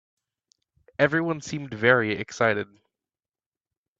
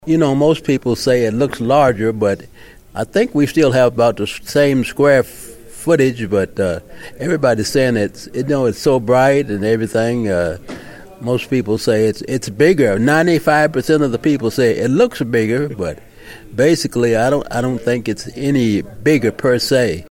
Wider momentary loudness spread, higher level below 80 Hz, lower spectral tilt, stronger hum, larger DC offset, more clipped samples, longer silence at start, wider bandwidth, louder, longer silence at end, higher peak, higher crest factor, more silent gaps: about the same, 13 LU vs 11 LU; second, -64 dBFS vs -44 dBFS; about the same, -5.5 dB/octave vs -6 dB/octave; neither; neither; neither; first, 1 s vs 0.05 s; second, 7.8 kHz vs 16.5 kHz; second, -24 LUFS vs -16 LUFS; first, 1.35 s vs 0.05 s; second, -4 dBFS vs 0 dBFS; first, 24 dB vs 16 dB; neither